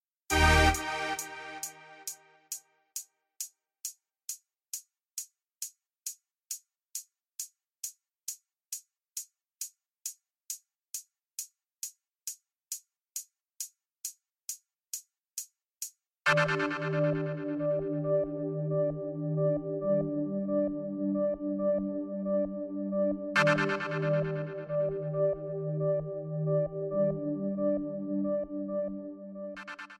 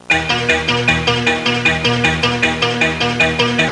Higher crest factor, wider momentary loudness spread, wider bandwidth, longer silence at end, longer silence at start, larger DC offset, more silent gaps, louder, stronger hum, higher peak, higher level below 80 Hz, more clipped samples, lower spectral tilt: first, 24 dB vs 14 dB; first, 13 LU vs 1 LU; first, 16 kHz vs 11.5 kHz; about the same, 0.05 s vs 0 s; first, 0.3 s vs 0.1 s; second, under 0.1% vs 0.2%; neither; second, -33 LUFS vs -14 LUFS; neither; second, -10 dBFS vs -2 dBFS; second, -46 dBFS vs -38 dBFS; neither; about the same, -4.5 dB/octave vs -4 dB/octave